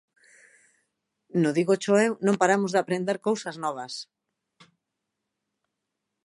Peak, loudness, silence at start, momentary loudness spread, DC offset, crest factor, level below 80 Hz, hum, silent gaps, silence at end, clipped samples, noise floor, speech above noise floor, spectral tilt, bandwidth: -6 dBFS; -25 LUFS; 1.35 s; 13 LU; under 0.1%; 22 dB; -76 dBFS; none; none; 2.2 s; under 0.1%; -83 dBFS; 59 dB; -5.5 dB/octave; 11.5 kHz